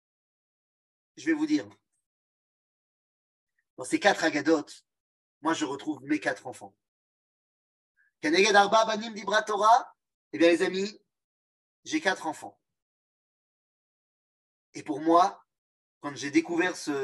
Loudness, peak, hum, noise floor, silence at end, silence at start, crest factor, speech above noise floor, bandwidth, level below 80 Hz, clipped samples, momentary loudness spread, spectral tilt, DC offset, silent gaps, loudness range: -26 LUFS; -6 dBFS; none; under -90 dBFS; 0 s; 1.2 s; 24 dB; over 64 dB; 12 kHz; -82 dBFS; under 0.1%; 19 LU; -3.5 dB/octave; under 0.1%; 2.06-3.47 s, 3.70-3.77 s, 5.00-5.41 s, 6.88-7.95 s, 10.14-10.31 s, 11.24-11.83 s, 12.82-14.73 s, 15.58-16.01 s; 11 LU